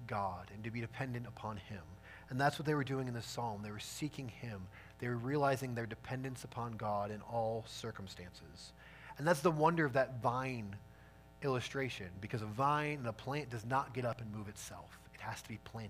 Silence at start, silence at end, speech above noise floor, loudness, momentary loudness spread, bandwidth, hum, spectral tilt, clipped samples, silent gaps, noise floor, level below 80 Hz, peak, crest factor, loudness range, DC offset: 0 s; 0 s; 21 dB; -39 LUFS; 17 LU; 15.5 kHz; none; -6 dB/octave; under 0.1%; none; -59 dBFS; -64 dBFS; -18 dBFS; 22 dB; 4 LU; under 0.1%